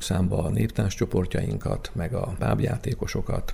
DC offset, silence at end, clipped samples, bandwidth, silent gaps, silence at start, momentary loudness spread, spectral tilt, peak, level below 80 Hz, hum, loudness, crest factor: under 0.1%; 0 s; under 0.1%; 15 kHz; none; 0 s; 5 LU; -6.5 dB/octave; -10 dBFS; -36 dBFS; none; -27 LUFS; 16 dB